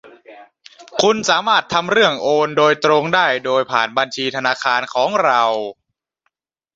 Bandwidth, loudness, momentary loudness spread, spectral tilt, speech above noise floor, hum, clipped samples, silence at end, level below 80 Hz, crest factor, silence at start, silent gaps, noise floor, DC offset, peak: 7.8 kHz; -16 LUFS; 5 LU; -3 dB/octave; 54 dB; none; under 0.1%; 1.05 s; -62 dBFS; 16 dB; 0.05 s; none; -71 dBFS; under 0.1%; 0 dBFS